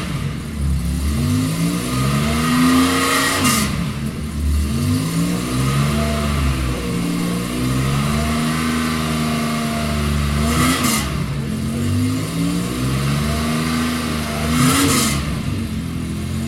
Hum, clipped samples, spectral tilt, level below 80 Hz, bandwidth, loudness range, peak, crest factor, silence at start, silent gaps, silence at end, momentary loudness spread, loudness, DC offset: none; under 0.1%; -4.5 dB/octave; -28 dBFS; 16.5 kHz; 3 LU; -2 dBFS; 16 dB; 0 s; none; 0 s; 8 LU; -19 LUFS; under 0.1%